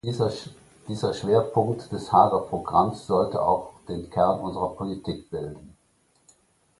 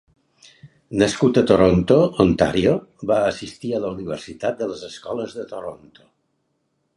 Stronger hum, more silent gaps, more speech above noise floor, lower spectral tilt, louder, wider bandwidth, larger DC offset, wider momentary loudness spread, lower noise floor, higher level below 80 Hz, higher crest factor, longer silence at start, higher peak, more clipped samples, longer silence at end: neither; neither; second, 41 dB vs 51 dB; about the same, -7 dB/octave vs -6.5 dB/octave; second, -25 LUFS vs -20 LUFS; about the same, 11.5 kHz vs 11.5 kHz; neither; about the same, 15 LU vs 15 LU; second, -65 dBFS vs -71 dBFS; second, -52 dBFS vs -44 dBFS; about the same, 22 dB vs 20 dB; second, 0.05 s vs 0.65 s; second, -4 dBFS vs 0 dBFS; neither; about the same, 1.1 s vs 1.2 s